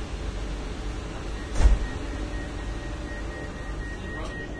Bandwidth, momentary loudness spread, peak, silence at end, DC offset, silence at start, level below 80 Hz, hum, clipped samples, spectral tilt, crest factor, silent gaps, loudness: 11 kHz; 11 LU; -6 dBFS; 0 s; under 0.1%; 0 s; -30 dBFS; none; under 0.1%; -5.5 dB/octave; 22 dB; none; -32 LUFS